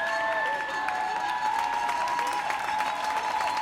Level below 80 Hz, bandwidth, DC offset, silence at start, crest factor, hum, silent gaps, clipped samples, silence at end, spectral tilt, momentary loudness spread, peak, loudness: -64 dBFS; 16.5 kHz; under 0.1%; 0 s; 14 dB; none; none; under 0.1%; 0 s; -1.5 dB/octave; 2 LU; -14 dBFS; -28 LUFS